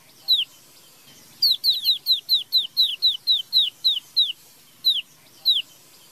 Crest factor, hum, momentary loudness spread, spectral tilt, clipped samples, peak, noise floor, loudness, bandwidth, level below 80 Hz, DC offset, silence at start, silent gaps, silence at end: 14 dB; none; 5 LU; 2 dB/octave; under 0.1%; -8 dBFS; -52 dBFS; -19 LUFS; 16 kHz; -80 dBFS; under 0.1%; 0.3 s; none; 0.5 s